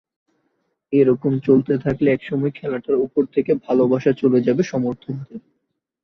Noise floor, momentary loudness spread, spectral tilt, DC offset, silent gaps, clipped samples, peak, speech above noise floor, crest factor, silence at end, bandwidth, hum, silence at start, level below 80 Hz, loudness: -70 dBFS; 11 LU; -8.5 dB/octave; under 0.1%; none; under 0.1%; -4 dBFS; 52 dB; 16 dB; 0.65 s; 6.4 kHz; none; 0.9 s; -56 dBFS; -19 LUFS